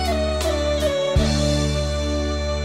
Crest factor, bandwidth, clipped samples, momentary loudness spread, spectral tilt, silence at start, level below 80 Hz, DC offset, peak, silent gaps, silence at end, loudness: 14 dB; 15.5 kHz; under 0.1%; 4 LU; -5 dB/octave; 0 s; -26 dBFS; 0.2%; -8 dBFS; none; 0 s; -21 LUFS